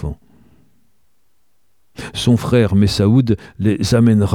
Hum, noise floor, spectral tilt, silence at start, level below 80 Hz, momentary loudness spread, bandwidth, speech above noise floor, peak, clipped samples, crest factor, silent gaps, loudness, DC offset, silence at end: none; -67 dBFS; -7 dB/octave; 0 s; -38 dBFS; 16 LU; 14.5 kHz; 54 dB; -2 dBFS; under 0.1%; 16 dB; none; -15 LUFS; 0.3%; 0 s